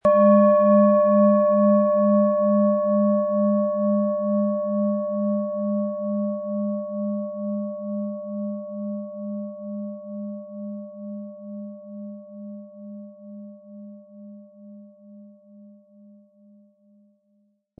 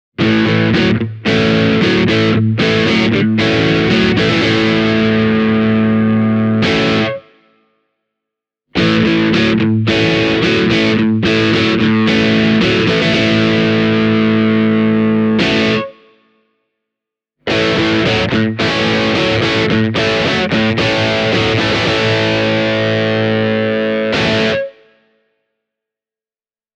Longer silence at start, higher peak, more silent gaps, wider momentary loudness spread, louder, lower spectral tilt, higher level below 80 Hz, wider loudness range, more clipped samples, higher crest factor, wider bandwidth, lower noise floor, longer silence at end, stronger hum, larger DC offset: second, 0.05 s vs 0.2 s; second, -6 dBFS vs 0 dBFS; neither; first, 23 LU vs 3 LU; second, -21 LUFS vs -13 LUFS; first, -12.5 dB/octave vs -6 dB/octave; second, -70 dBFS vs -40 dBFS; first, 23 LU vs 4 LU; neither; about the same, 18 dB vs 14 dB; second, 2.6 kHz vs 8.4 kHz; second, -66 dBFS vs under -90 dBFS; about the same, 2.1 s vs 2.1 s; neither; neither